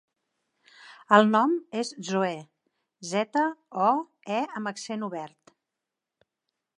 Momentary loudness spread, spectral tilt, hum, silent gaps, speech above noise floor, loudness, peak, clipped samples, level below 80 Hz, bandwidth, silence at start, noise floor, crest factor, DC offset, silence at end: 15 LU; -5 dB/octave; none; none; 61 dB; -26 LUFS; -4 dBFS; under 0.1%; -84 dBFS; 10.5 kHz; 0.85 s; -87 dBFS; 24 dB; under 0.1%; 1.5 s